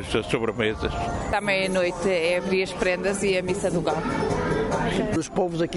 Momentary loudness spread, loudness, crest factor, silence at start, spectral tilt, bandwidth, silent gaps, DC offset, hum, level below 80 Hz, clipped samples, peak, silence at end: 3 LU; -24 LUFS; 16 dB; 0 s; -5 dB/octave; 11.5 kHz; none; under 0.1%; none; -40 dBFS; under 0.1%; -8 dBFS; 0 s